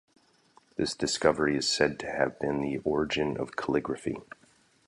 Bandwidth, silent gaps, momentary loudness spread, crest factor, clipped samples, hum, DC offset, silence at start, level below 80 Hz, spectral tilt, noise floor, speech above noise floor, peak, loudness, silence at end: 11.5 kHz; none; 9 LU; 22 dB; under 0.1%; none; under 0.1%; 0.8 s; -56 dBFS; -4 dB/octave; -63 dBFS; 34 dB; -8 dBFS; -29 LUFS; 0.65 s